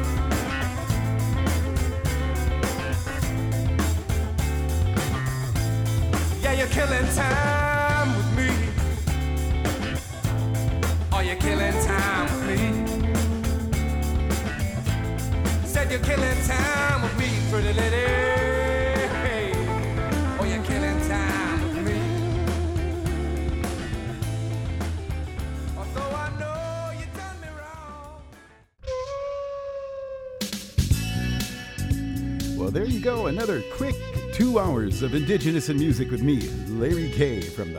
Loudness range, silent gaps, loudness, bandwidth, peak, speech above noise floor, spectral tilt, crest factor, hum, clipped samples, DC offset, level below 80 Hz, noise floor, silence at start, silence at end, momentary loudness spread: 8 LU; none; -25 LUFS; 19.5 kHz; -8 dBFS; 29 dB; -5.5 dB/octave; 16 dB; none; under 0.1%; under 0.1%; -30 dBFS; -52 dBFS; 0 s; 0 s; 9 LU